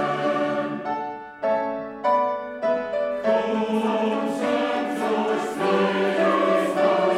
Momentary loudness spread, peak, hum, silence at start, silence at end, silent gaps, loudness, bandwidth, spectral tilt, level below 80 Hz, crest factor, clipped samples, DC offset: 7 LU; -8 dBFS; none; 0 s; 0 s; none; -23 LUFS; 14 kHz; -5.5 dB/octave; -66 dBFS; 14 dB; under 0.1%; under 0.1%